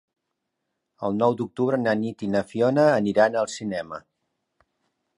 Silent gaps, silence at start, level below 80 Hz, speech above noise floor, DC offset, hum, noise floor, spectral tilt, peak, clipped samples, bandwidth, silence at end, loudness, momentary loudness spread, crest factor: none; 1 s; -64 dBFS; 58 dB; under 0.1%; none; -80 dBFS; -6 dB/octave; -6 dBFS; under 0.1%; 11 kHz; 1.2 s; -23 LUFS; 12 LU; 20 dB